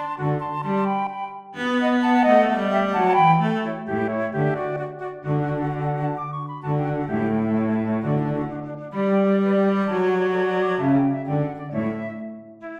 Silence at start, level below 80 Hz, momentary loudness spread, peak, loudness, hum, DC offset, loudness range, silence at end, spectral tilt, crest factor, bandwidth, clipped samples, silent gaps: 0 s; -58 dBFS; 12 LU; -6 dBFS; -22 LUFS; none; under 0.1%; 5 LU; 0 s; -8.5 dB/octave; 16 dB; 8.6 kHz; under 0.1%; none